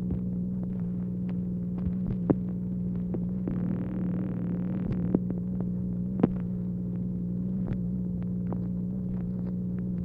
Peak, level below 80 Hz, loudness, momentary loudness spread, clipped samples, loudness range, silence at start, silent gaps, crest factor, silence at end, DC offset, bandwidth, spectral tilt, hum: -8 dBFS; -46 dBFS; -31 LUFS; 4 LU; under 0.1%; 2 LU; 0 s; none; 22 dB; 0 s; under 0.1%; 3 kHz; -12.5 dB/octave; 60 Hz at -40 dBFS